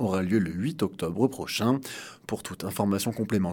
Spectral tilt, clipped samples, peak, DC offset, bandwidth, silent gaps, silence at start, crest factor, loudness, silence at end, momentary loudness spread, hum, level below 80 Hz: -5.5 dB/octave; under 0.1%; -8 dBFS; under 0.1%; 18 kHz; none; 0 s; 18 dB; -28 LUFS; 0 s; 10 LU; none; -62 dBFS